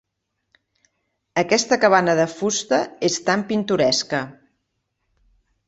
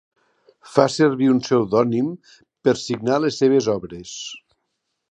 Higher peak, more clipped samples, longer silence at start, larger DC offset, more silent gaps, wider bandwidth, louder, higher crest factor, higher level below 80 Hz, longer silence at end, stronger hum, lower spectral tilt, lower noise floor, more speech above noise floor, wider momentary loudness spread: about the same, -2 dBFS vs 0 dBFS; neither; first, 1.35 s vs 0.65 s; neither; neither; second, 8.2 kHz vs 9.8 kHz; about the same, -20 LUFS vs -19 LUFS; about the same, 20 dB vs 20 dB; about the same, -62 dBFS vs -60 dBFS; first, 1.35 s vs 0.75 s; neither; second, -3.5 dB/octave vs -5.5 dB/octave; about the same, -77 dBFS vs -76 dBFS; about the same, 57 dB vs 56 dB; second, 10 LU vs 15 LU